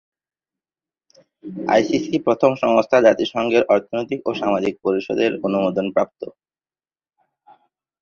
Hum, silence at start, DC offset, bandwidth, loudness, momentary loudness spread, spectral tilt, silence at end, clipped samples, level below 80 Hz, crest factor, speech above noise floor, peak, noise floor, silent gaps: none; 1.45 s; under 0.1%; 7.2 kHz; -19 LUFS; 11 LU; -6 dB/octave; 1.7 s; under 0.1%; -60 dBFS; 20 dB; over 71 dB; -2 dBFS; under -90 dBFS; none